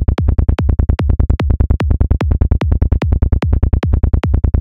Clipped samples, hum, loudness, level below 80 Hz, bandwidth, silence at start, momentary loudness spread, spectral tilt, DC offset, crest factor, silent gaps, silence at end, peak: under 0.1%; none; -15 LUFS; -14 dBFS; 5.6 kHz; 0 s; 0 LU; -9 dB/octave; 2%; 10 dB; none; 0 s; -2 dBFS